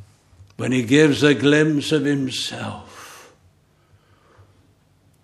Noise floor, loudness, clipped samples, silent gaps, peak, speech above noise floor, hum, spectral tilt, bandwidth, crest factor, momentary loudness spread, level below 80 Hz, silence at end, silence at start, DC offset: -58 dBFS; -18 LUFS; under 0.1%; none; 0 dBFS; 40 dB; none; -5 dB/octave; 13 kHz; 20 dB; 23 LU; -62 dBFS; 2.05 s; 0.6 s; under 0.1%